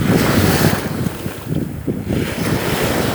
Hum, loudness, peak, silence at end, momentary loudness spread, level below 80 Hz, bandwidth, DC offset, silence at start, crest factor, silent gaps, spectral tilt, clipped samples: none; -18 LUFS; 0 dBFS; 0 s; 9 LU; -36 dBFS; over 20 kHz; under 0.1%; 0 s; 18 dB; none; -5.5 dB/octave; under 0.1%